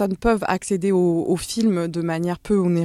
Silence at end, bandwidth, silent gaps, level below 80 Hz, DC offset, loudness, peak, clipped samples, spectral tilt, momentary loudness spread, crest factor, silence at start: 0 s; 15 kHz; none; -42 dBFS; under 0.1%; -21 LUFS; -6 dBFS; under 0.1%; -6.5 dB/octave; 5 LU; 14 dB; 0 s